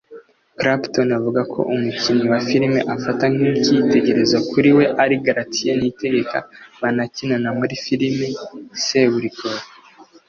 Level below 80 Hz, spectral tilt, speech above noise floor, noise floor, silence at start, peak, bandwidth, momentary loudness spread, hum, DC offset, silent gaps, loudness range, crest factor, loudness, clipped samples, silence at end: -56 dBFS; -5 dB/octave; 29 dB; -47 dBFS; 0.1 s; -2 dBFS; 7.2 kHz; 10 LU; none; under 0.1%; none; 5 LU; 16 dB; -18 LUFS; under 0.1%; 0.25 s